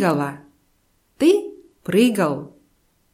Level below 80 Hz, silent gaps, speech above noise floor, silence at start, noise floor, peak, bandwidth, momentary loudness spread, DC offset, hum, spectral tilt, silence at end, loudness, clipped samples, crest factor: -62 dBFS; none; 45 dB; 0 s; -64 dBFS; -4 dBFS; 16 kHz; 20 LU; under 0.1%; none; -6 dB/octave; 0.65 s; -20 LUFS; under 0.1%; 18 dB